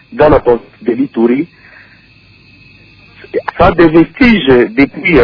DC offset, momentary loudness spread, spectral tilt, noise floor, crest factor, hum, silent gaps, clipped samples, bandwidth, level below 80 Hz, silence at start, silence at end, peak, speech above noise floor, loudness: under 0.1%; 11 LU; -8.5 dB/octave; -43 dBFS; 10 dB; none; none; 0.9%; 5.4 kHz; -30 dBFS; 0.1 s; 0 s; 0 dBFS; 34 dB; -10 LUFS